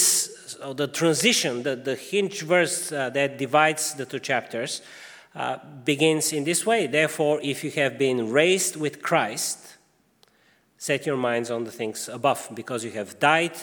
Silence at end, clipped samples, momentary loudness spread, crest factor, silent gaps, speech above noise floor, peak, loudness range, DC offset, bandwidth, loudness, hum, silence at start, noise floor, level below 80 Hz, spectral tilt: 0 s; under 0.1%; 11 LU; 20 dB; none; 38 dB; -4 dBFS; 5 LU; under 0.1%; over 20 kHz; -24 LUFS; none; 0 s; -62 dBFS; -78 dBFS; -3 dB/octave